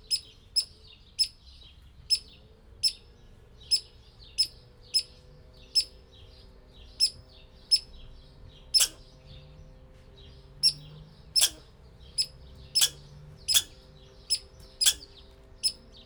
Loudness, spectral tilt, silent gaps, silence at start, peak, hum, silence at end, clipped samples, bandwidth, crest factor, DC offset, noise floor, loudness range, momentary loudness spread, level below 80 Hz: -27 LUFS; 1 dB/octave; none; 0.1 s; -6 dBFS; none; 0.3 s; under 0.1%; over 20 kHz; 28 dB; under 0.1%; -53 dBFS; 3 LU; 15 LU; -54 dBFS